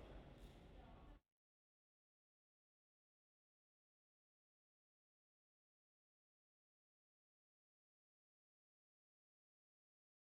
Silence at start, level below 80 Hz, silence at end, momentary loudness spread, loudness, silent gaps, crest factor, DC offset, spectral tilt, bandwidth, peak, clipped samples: 0 s; -74 dBFS; 9.1 s; 5 LU; -64 LUFS; none; 22 dB; under 0.1%; -5.5 dB/octave; 5.8 kHz; -48 dBFS; under 0.1%